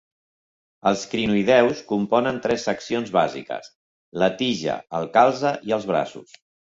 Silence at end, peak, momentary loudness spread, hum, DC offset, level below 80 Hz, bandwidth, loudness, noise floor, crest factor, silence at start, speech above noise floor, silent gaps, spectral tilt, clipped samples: 0.5 s; -2 dBFS; 10 LU; none; under 0.1%; -60 dBFS; 7.8 kHz; -22 LUFS; under -90 dBFS; 20 dB; 0.85 s; over 68 dB; 3.75-4.12 s; -5 dB/octave; under 0.1%